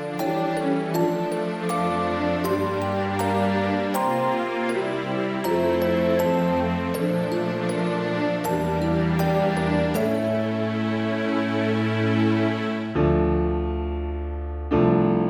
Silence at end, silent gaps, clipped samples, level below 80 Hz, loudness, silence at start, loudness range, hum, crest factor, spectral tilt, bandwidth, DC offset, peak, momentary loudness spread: 0 s; none; under 0.1%; -38 dBFS; -24 LUFS; 0 s; 1 LU; none; 16 dB; -7 dB/octave; 17.5 kHz; under 0.1%; -8 dBFS; 5 LU